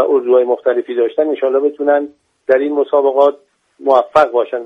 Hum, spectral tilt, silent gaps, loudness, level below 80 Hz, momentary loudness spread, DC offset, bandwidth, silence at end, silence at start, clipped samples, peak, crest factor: none; -6 dB/octave; none; -14 LUFS; -62 dBFS; 5 LU; under 0.1%; 7.8 kHz; 0 s; 0 s; under 0.1%; 0 dBFS; 14 dB